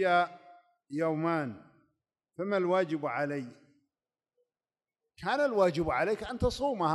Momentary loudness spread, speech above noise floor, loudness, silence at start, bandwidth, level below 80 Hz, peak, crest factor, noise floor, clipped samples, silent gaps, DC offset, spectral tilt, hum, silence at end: 13 LU; over 60 dB; -31 LUFS; 0 s; 12 kHz; -54 dBFS; -14 dBFS; 18 dB; under -90 dBFS; under 0.1%; none; under 0.1%; -6.5 dB/octave; none; 0 s